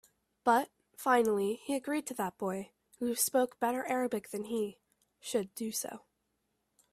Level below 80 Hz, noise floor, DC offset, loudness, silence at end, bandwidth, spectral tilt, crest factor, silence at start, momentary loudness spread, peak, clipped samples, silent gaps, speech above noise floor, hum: -76 dBFS; -81 dBFS; under 0.1%; -33 LUFS; 0.95 s; 16 kHz; -3.5 dB/octave; 20 dB; 0.45 s; 12 LU; -14 dBFS; under 0.1%; none; 48 dB; none